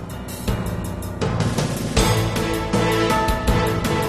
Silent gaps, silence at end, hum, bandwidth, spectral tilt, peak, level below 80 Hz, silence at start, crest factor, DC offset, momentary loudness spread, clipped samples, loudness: none; 0 s; none; 13.5 kHz; -5 dB/octave; -2 dBFS; -30 dBFS; 0 s; 18 dB; 0.3%; 9 LU; under 0.1%; -21 LUFS